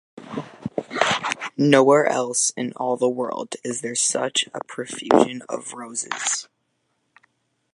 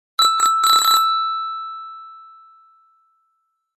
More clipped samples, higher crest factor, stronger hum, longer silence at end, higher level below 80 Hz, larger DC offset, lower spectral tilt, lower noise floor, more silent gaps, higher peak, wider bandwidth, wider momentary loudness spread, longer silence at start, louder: neither; about the same, 22 dB vs 18 dB; neither; second, 1.3 s vs 1.55 s; first, -66 dBFS vs -88 dBFS; neither; first, -3 dB/octave vs 3.5 dB/octave; about the same, -72 dBFS vs -70 dBFS; neither; first, 0 dBFS vs -4 dBFS; second, 11.5 kHz vs 14.5 kHz; second, 15 LU vs 21 LU; about the same, 0.15 s vs 0.2 s; second, -22 LUFS vs -15 LUFS